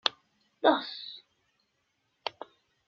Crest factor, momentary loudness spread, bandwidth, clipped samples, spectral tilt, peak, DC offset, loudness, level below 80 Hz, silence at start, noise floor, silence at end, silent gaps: 26 dB; 23 LU; 7.4 kHz; under 0.1%; 1 dB/octave; -8 dBFS; under 0.1%; -31 LUFS; -86 dBFS; 0.05 s; -77 dBFS; 0.6 s; none